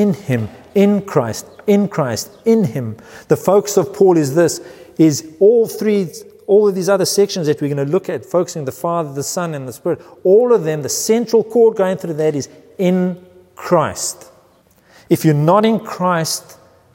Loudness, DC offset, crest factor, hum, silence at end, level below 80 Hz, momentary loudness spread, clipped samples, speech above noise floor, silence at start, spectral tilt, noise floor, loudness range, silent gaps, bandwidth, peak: -16 LUFS; under 0.1%; 14 dB; none; 0.4 s; -60 dBFS; 11 LU; under 0.1%; 37 dB; 0 s; -5.5 dB/octave; -52 dBFS; 3 LU; none; 16.5 kHz; 0 dBFS